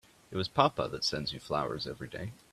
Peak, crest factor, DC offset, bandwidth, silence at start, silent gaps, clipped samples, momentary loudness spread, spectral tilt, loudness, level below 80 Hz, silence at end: -10 dBFS; 24 dB; under 0.1%; 14 kHz; 0.3 s; none; under 0.1%; 13 LU; -4.5 dB/octave; -33 LUFS; -60 dBFS; 0.2 s